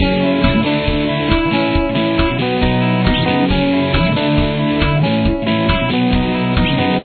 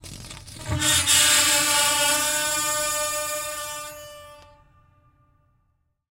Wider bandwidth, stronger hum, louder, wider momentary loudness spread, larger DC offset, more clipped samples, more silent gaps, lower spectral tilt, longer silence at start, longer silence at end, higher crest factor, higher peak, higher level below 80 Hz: second, 4.6 kHz vs 16 kHz; neither; first, -15 LUFS vs -19 LUFS; second, 2 LU vs 23 LU; neither; neither; neither; first, -9.5 dB/octave vs -0.5 dB/octave; about the same, 0 s vs 0.05 s; second, 0 s vs 1.75 s; second, 14 dB vs 20 dB; first, 0 dBFS vs -4 dBFS; first, -24 dBFS vs -50 dBFS